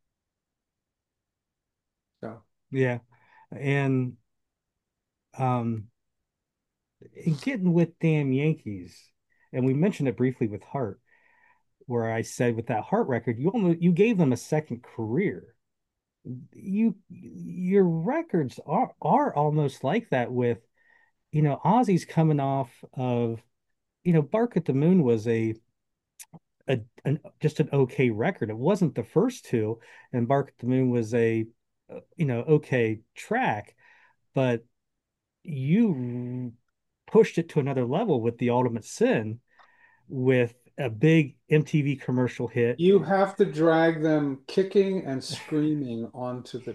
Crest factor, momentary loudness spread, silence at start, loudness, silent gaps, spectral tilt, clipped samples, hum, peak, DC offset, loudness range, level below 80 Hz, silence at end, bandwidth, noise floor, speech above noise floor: 20 dB; 14 LU; 2.2 s; -26 LUFS; none; -7.5 dB/octave; under 0.1%; none; -8 dBFS; under 0.1%; 7 LU; -70 dBFS; 0 s; 12.5 kHz; -86 dBFS; 61 dB